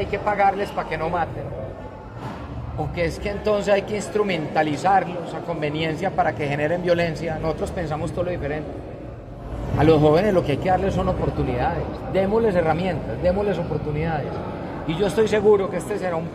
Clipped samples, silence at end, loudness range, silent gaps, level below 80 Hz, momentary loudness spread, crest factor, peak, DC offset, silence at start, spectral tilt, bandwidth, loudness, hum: under 0.1%; 0 s; 5 LU; none; -38 dBFS; 14 LU; 20 dB; -4 dBFS; under 0.1%; 0 s; -7 dB/octave; 14.5 kHz; -22 LUFS; none